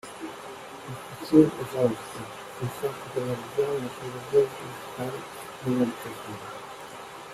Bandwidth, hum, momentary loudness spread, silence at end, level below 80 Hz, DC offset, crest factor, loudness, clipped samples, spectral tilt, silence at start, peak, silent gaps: 15.5 kHz; none; 17 LU; 0 s; -64 dBFS; under 0.1%; 24 dB; -28 LUFS; under 0.1%; -6 dB/octave; 0.05 s; -4 dBFS; none